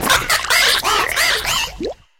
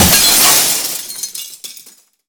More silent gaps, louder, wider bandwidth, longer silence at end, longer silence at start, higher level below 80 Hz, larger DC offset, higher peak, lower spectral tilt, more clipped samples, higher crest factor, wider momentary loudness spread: neither; second, -15 LUFS vs -9 LUFS; second, 18 kHz vs over 20 kHz; second, 0.25 s vs 0.45 s; about the same, 0 s vs 0 s; about the same, -38 dBFS vs -38 dBFS; neither; about the same, -2 dBFS vs 0 dBFS; about the same, -0.5 dB/octave vs -1 dB/octave; neither; about the same, 16 dB vs 14 dB; second, 8 LU vs 22 LU